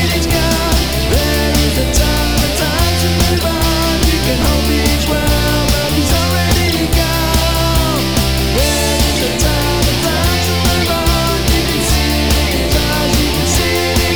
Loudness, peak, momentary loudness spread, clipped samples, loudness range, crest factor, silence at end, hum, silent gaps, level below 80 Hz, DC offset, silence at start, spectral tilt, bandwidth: -13 LUFS; 0 dBFS; 1 LU; under 0.1%; 0 LU; 12 dB; 0 s; none; none; -18 dBFS; 2%; 0 s; -4 dB/octave; 19.5 kHz